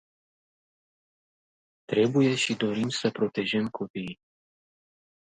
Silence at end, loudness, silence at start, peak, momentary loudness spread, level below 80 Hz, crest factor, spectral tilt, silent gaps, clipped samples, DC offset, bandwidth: 1.15 s; -27 LUFS; 1.9 s; -10 dBFS; 13 LU; -70 dBFS; 20 dB; -5 dB/octave; 3.90-3.94 s; under 0.1%; under 0.1%; 9.4 kHz